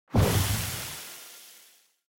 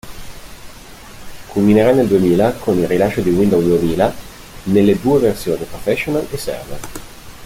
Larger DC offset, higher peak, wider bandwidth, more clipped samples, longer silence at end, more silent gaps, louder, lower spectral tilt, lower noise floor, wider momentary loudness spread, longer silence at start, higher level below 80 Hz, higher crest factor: neither; second, -12 dBFS vs -2 dBFS; about the same, 17 kHz vs 16.5 kHz; neither; first, 0.65 s vs 0 s; neither; second, -28 LUFS vs -15 LUFS; second, -4.5 dB/octave vs -6.5 dB/octave; first, -59 dBFS vs -36 dBFS; about the same, 22 LU vs 22 LU; about the same, 0.1 s vs 0.05 s; about the same, -40 dBFS vs -38 dBFS; about the same, 18 dB vs 14 dB